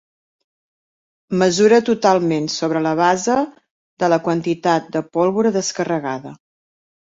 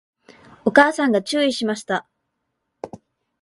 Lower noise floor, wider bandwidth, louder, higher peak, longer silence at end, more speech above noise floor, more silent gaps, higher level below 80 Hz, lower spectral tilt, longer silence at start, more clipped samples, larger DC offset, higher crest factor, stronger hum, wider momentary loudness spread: first, under -90 dBFS vs -76 dBFS; second, 8 kHz vs 11.5 kHz; about the same, -18 LUFS vs -19 LUFS; about the same, -2 dBFS vs 0 dBFS; first, 0.75 s vs 0.45 s; first, over 73 dB vs 58 dB; first, 3.71-3.97 s vs none; about the same, -62 dBFS vs -64 dBFS; about the same, -5 dB/octave vs -4 dB/octave; first, 1.3 s vs 0.65 s; neither; neither; about the same, 18 dB vs 22 dB; neither; second, 9 LU vs 23 LU